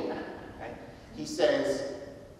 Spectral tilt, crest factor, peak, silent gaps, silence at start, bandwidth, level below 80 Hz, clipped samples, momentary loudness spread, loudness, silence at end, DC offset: -4 dB/octave; 20 dB; -12 dBFS; none; 0 s; 14 kHz; -58 dBFS; under 0.1%; 17 LU; -31 LUFS; 0 s; under 0.1%